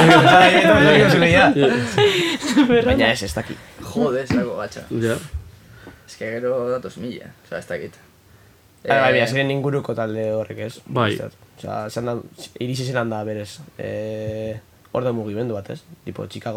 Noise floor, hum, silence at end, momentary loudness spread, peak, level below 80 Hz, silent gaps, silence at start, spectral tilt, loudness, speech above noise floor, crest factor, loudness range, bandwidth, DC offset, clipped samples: -51 dBFS; none; 0 s; 21 LU; 0 dBFS; -44 dBFS; none; 0 s; -5.5 dB/octave; -18 LUFS; 32 dB; 20 dB; 12 LU; 17 kHz; under 0.1%; under 0.1%